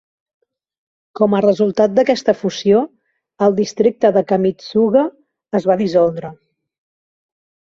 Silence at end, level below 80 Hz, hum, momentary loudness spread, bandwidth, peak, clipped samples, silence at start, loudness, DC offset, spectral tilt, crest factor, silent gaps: 1.4 s; -58 dBFS; none; 6 LU; 7.6 kHz; -2 dBFS; under 0.1%; 1.15 s; -16 LUFS; under 0.1%; -6.5 dB/octave; 16 dB; none